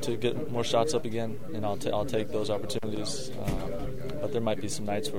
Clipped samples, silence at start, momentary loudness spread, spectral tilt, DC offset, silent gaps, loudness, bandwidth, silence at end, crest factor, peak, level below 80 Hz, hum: under 0.1%; 0 s; 8 LU; -5 dB/octave; 3%; none; -31 LUFS; 16 kHz; 0 s; 20 dB; -10 dBFS; -46 dBFS; none